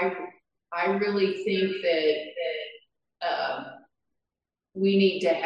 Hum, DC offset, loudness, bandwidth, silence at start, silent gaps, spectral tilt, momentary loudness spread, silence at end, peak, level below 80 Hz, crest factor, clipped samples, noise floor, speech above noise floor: none; under 0.1%; -26 LUFS; 7.8 kHz; 0 s; none; -6.5 dB/octave; 16 LU; 0 s; -10 dBFS; -78 dBFS; 16 dB; under 0.1%; -89 dBFS; 64 dB